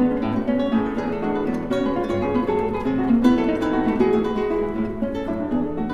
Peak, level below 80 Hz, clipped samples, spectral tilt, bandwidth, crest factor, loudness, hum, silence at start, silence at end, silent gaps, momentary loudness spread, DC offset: -4 dBFS; -40 dBFS; under 0.1%; -8 dB/octave; 7.6 kHz; 16 dB; -22 LUFS; none; 0 s; 0 s; none; 7 LU; under 0.1%